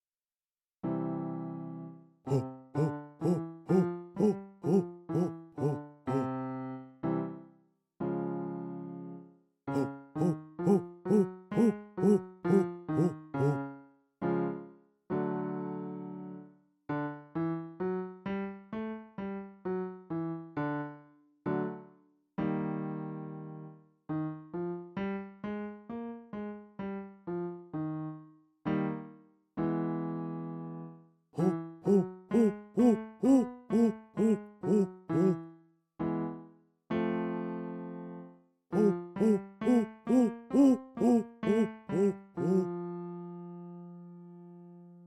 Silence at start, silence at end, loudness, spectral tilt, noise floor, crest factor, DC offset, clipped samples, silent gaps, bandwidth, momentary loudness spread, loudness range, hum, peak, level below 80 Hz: 0.85 s; 0 s; -33 LUFS; -9 dB/octave; under -90 dBFS; 18 dB; under 0.1%; under 0.1%; none; 11.5 kHz; 16 LU; 10 LU; none; -14 dBFS; -70 dBFS